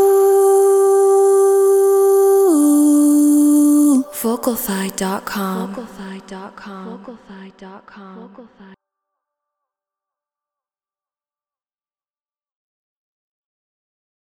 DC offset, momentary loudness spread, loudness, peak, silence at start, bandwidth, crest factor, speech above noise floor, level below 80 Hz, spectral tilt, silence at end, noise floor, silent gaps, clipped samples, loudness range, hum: under 0.1%; 20 LU; -14 LUFS; -4 dBFS; 0 s; 17.5 kHz; 12 dB; over 64 dB; -62 dBFS; -5 dB/octave; 5.95 s; under -90 dBFS; none; under 0.1%; 22 LU; none